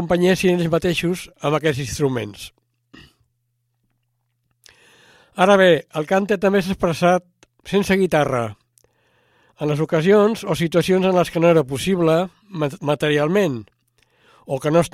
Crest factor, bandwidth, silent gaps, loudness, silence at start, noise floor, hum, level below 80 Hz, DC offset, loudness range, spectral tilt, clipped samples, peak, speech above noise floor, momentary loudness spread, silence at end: 20 dB; 16 kHz; none; -19 LUFS; 0 s; -71 dBFS; none; -50 dBFS; under 0.1%; 8 LU; -6 dB/octave; under 0.1%; 0 dBFS; 53 dB; 10 LU; 0.05 s